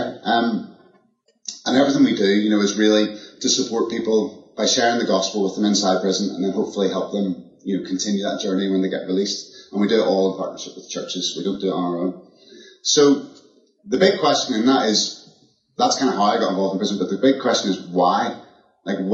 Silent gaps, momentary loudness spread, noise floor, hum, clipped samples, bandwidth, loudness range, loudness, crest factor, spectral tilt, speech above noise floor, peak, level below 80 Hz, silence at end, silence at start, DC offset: none; 12 LU; -61 dBFS; none; under 0.1%; 8 kHz; 4 LU; -20 LUFS; 18 dB; -4 dB/octave; 42 dB; -2 dBFS; -70 dBFS; 0 s; 0 s; under 0.1%